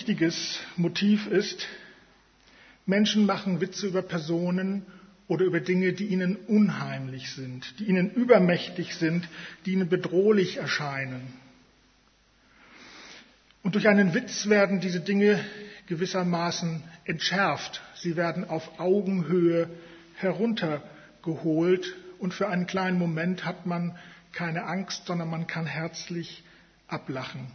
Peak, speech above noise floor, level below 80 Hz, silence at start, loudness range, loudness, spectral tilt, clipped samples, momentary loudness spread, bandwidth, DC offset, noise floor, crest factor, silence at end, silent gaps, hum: -6 dBFS; 36 dB; -68 dBFS; 0 s; 5 LU; -27 LUFS; -6 dB/octave; under 0.1%; 15 LU; 6.6 kHz; under 0.1%; -63 dBFS; 22 dB; 0 s; none; none